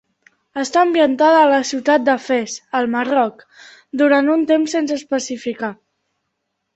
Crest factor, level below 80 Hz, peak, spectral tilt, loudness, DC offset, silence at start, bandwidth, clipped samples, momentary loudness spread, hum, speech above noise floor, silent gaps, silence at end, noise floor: 16 dB; -66 dBFS; -2 dBFS; -3 dB/octave; -17 LUFS; under 0.1%; 0.55 s; 8.2 kHz; under 0.1%; 12 LU; none; 58 dB; none; 1 s; -74 dBFS